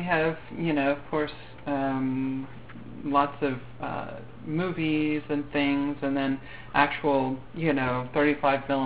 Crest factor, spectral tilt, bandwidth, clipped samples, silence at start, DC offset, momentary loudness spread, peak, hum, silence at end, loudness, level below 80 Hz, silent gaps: 22 dB; -4.5 dB/octave; 4.9 kHz; under 0.1%; 0 s; 0.6%; 11 LU; -6 dBFS; none; 0 s; -28 LUFS; -54 dBFS; none